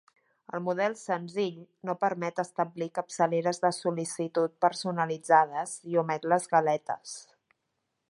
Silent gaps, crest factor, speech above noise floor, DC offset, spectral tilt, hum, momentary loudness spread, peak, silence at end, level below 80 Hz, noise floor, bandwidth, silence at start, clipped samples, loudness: none; 22 dB; 52 dB; under 0.1%; -5 dB/octave; none; 11 LU; -8 dBFS; 0.85 s; -82 dBFS; -81 dBFS; 11.5 kHz; 0.55 s; under 0.1%; -29 LUFS